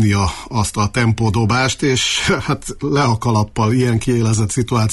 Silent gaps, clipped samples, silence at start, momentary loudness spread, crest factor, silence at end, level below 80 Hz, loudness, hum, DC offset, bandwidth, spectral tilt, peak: none; under 0.1%; 0 s; 4 LU; 12 dB; 0 s; -36 dBFS; -17 LUFS; none; under 0.1%; 12 kHz; -5 dB/octave; -4 dBFS